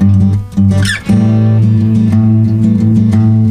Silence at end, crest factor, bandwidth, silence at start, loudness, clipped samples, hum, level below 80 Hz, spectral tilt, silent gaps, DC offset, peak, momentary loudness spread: 0 s; 8 dB; 11.5 kHz; 0 s; -10 LUFS; under 0.1%; none; -34 dBFS; -7.5 dB/octave; none; under 0.1%; 0 dBFS; 2 LU